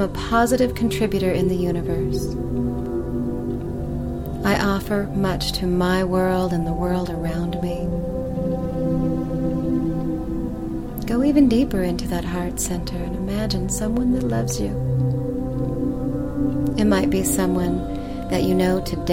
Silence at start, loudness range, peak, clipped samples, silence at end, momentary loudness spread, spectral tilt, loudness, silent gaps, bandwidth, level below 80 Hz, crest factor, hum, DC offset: 0 s; 3 LU; -6 dBFS; under 0.1%; 0 s; 8 LU; -6 dB/octave; -22 LUFS; none; 17 kHz; -32 dBFS; 16 dB; none; 0.3%